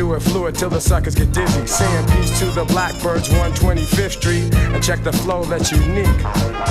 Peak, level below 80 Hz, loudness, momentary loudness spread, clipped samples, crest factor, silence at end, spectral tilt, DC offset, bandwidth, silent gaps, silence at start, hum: -2 dBFS; -22 dBFS; -17 LUFS; 3 LU; under 0.1%; 14 dB; 0 s; -5 dB/octave; under 0.1%; 16 kHz; none; 0 s; none